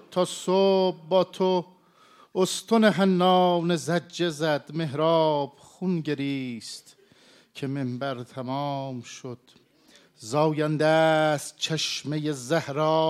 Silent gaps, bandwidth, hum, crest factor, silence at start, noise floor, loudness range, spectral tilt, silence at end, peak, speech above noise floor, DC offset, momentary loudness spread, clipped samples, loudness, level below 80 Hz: none; 15 kHz; none; 20 dB; 0.1 s; -58 dBFS; 10 LU; -5 dB/octave; 0 s; -6 dBFS; 33 dB; under 0.1%; 15 LU; under 0.1%; -25 LUFS; -74 dBFS